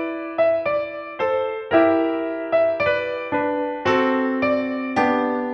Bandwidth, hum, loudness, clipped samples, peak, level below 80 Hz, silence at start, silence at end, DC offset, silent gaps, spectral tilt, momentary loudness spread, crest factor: 7 kHz; none; -21 LUFS; under 0.1%; -4 dBFS; -60 dBFS; 0 s; 0 s; under 0.1%; none; -6.5 dB/octave; 6 LU; 16 dB